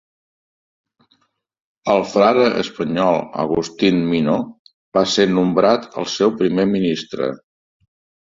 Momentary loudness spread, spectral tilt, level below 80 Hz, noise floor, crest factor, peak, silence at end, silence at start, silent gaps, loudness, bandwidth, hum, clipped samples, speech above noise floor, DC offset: 9 LU; -5.5 dB/octave; -56 dBFS; -64 dBFS; 18 dB; -2 dBFS; 0.95 s; 1.85 s; 4.59-4.65 s, 4.74-4.92 s; -18 LUFS; 7.8 kHz; none; under 0.1%; 48 dB; under 0.1%